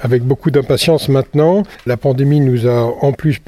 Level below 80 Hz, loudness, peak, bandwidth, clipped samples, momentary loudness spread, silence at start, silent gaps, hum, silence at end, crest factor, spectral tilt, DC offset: -42 dBFS; -14 LUFS; 0 dBFS; 14.5 kHz; under 0.1%; 4 LU; 0 s; none; none; 0.1 s; 12 dB; -7 dB/octave; under 0.1%